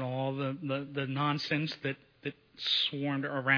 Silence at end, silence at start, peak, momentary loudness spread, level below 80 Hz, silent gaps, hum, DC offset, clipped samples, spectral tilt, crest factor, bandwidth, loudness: 0 s; 0 s; -12 dBFS; 12 LU; -74 dBFS; none; none; under 0.1%; under 0.1%; -6 dB/octave; 20 dB; 5.4 kHz; -33 LUFS